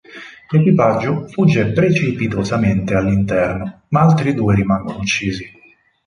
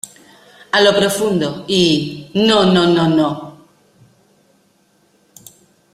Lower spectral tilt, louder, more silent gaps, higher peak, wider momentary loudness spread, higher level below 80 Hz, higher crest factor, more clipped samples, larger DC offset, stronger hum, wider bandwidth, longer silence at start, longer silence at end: first, -7 dB/octave vs -5 dB/octave; about the same, -16 LUFS vs -14 LUFS; neither; about the same, -2 dBFS vs 0 dBFS; about the same, 9 LU vs 10 LU; first, -40 dBFS vs -54 dBFS; about the same, 14 dB vs 16 dB; neither; neither; neither; second, 10.5 kHz vs 15.5 kHz; about the same, 0.1 s vs 0.05 s; second, 0.6 s vs 2.45 s